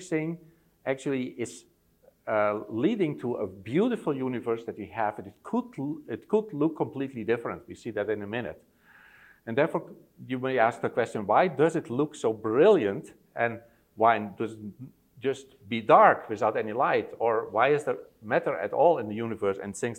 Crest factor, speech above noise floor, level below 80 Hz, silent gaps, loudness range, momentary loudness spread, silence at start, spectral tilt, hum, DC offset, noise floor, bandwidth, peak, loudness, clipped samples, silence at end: 22 dB; 35 dB; -70 dBFS; none; 7 LU; 14 LU; 0 s; -6.5 dB/octave; none; under 0.1%; -63 dBFS; 13 kHz; -4 dBFS; -27 LUFS; under 0.1%; 0 s